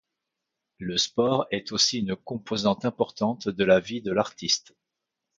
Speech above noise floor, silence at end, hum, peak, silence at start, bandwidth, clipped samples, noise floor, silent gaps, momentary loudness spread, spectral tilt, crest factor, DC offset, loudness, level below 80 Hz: 59 dB; 0.8 s; none; -8 dBFS; 0.8 s; 9.2 kHz; under 0.1%; -85 dBFS; none; 8 LU; -3.5 dB/octave; 20 dB; under 0.1%; -25 LUFS; -60 dBFS